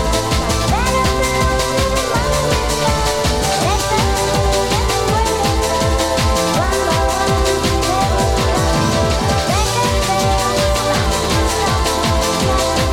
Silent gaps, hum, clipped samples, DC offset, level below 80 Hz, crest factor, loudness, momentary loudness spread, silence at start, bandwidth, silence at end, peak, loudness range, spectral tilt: none; none; under 0.1%; under 0.1%; -22 dBFS; 14 dB; -16 LUFS; 1 LU; 0 s; 18 kHz; 0 s; -2 dBFS; 0 LU; -4 dB/octave